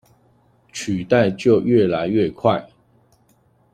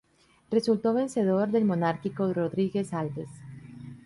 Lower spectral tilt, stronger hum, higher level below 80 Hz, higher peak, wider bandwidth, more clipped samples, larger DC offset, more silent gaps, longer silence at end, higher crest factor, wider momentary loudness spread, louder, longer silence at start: about the same, -6.5 dB/octave vs -7.5 dB/octave; neither; first, -56 dBFS vs -66 dBFS; first, -2 dBFS vs -12 dBFS; about the same, 10.5 kHz vs 11.5 kHz; neither; neither; neither; first, 1.1 s vs 0.1 s; about the same, 18 dB vs 16 dB; second, 10 LU vs 19 LU; first, -19 LUFS vs -27 LUFS; first, 0.75 s vs 0.5 s